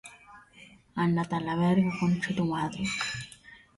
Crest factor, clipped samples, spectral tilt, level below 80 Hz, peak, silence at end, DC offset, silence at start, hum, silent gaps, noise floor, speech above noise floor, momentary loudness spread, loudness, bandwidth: 16 dB; under 0.1%; -6 dB/octave; -58 dBFS; -14 dBFS; 0.2 s; under 0.1%; 0.05 s; none; none; -55 dBFS; 27 dB; 15 LU; -29 LUFS; 11.5 kHz